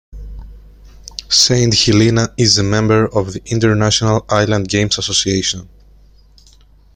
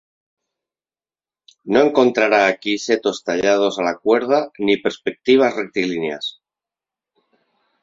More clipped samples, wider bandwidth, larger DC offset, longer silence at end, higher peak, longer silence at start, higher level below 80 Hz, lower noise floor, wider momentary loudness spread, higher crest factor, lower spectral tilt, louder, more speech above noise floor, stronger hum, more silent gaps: neither; first, 16 kHz vs 7.8 kHz; neither; second, 1.3 s vs 1.55 s; about the same, 0 dBFS vs -2 dBFS; second, 0.15 s vs 1.65 s; first, -36 dBFS vs -62 dBFS; second, -46 dBFS vs under -90 dBFS; first, 16 LU vs 9 LU; about the same, 16 dB vs 18 dB; about the same, -4 dB/octave vs -4 dB/octave; first, -13 LUFS vs -18 LUFS; second, 32 dB vs over 73 dB; neither; neither